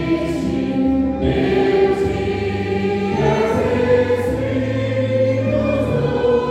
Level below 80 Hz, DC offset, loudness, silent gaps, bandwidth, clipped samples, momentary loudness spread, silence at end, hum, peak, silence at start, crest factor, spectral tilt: -34 dBFS; under 0.1%; -18 LUFS; none; 13.5 kHz; under 0.1%; 4 LU; 0 s; none; -2 dBFS; 0 s; 14 dB; -7.5 dB/octave